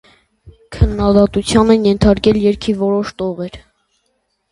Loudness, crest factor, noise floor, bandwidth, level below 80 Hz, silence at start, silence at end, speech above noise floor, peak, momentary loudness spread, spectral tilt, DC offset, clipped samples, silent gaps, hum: -14 LUFS; 16 dB; -66 dBFS; 11.5 kHz; -28 dBFS; 0.45 s; 0.95 s; 53 dB; 0 dBFS; 11 LU; -6.5 dB/octave; under 0.1%; under 0.1%; none; none